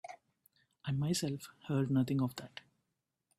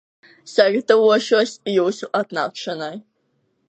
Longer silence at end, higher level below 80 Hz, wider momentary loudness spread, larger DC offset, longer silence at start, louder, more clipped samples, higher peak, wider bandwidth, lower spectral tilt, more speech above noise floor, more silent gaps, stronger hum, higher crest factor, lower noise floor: about the same, 0.8 s vs 0.7 s; first, -72 dBFS vs -78 dBFS; first, 20 LU vs 13 LU; neither; second, 0.05 s vs 0.45 s; second, -36 LUFS vs -19 LUFS; neither; second, -22 dBFS vs -2 dBFS; first, 15.5 kHz vs 8.6 kHz; first, -6 dB/octave vs -4 dB/octave; about the same, 51 dB vs 49 dB; neither; neither; about the same, 16 dB vs 18 dB; first, -86 dBFS vs -68 dBFS